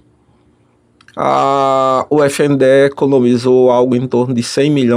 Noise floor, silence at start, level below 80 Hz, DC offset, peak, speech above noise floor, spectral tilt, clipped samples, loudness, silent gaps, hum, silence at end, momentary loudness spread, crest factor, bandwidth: -53 dBFS; 1.15 s; -56 dBFS; under 0.1%; -2 dBFS; 42 dB; -6 dB/octave; under 0.1%; -12 LUFS; none; none; 0 s; 5 LU; 10 dB; 14.5 kHz